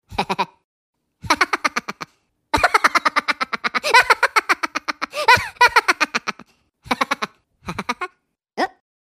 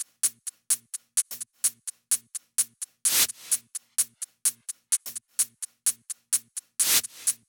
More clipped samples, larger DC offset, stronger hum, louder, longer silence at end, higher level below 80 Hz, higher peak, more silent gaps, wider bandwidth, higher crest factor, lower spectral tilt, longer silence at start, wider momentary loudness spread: neither; neither; neither; first, -18 LUFS vs -26 LUFS; first, 0.45 s vs 0.15 s; first, -50 dBFS vs -78 dBFS; first, 0 dBFS vs -10 dBFS; first, 0.64-0.93 s vs none; second, 16 kHz vs over 20 kHz; about the same, 20 dB vs 20 dB; first, -2 dB/octave vs 3 dB/octave; about the same, 0.1 s vs 0 s; first, 16 LU vs 9 LU